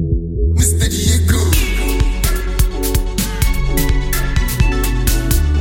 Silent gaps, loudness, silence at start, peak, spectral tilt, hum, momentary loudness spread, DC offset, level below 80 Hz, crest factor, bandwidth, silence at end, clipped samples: none; -16 LUFS; 0 s; 0 dBFS; -4.5 dB/octave; none; 5 LU; under 0.1%; -16 dBFS; 14 dB; 17 kHz; 0 s; under 0.1%